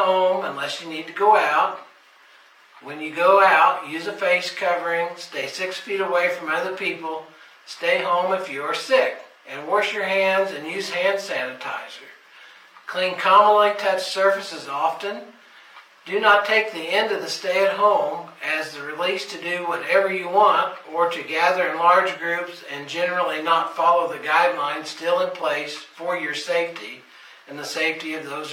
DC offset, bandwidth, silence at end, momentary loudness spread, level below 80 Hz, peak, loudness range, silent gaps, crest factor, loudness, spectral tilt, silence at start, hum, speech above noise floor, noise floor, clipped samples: under 0.1%; 16.5 kHz; 0 s; 14 LU; -78 dBFS; -4 dBFS; 4 LU; none; 18 dB; -21 LUFS; -3 dB/octave; 0 s; none; 30 dB; -52 dBFS; under 0.1%